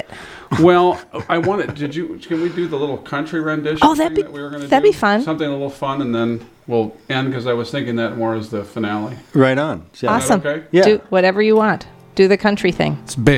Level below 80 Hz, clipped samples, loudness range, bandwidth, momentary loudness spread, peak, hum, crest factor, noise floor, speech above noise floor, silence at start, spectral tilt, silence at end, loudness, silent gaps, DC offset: -46 dBFS; under 0.1%; 6 LU; 15.5 kHz; 11 LU; 0 dBFS; none; 16 dB; -36 dBFS; 19 dB; 0.1 s; -6 dB/octave; 0 s; -17 LUFS; none; under 0.1%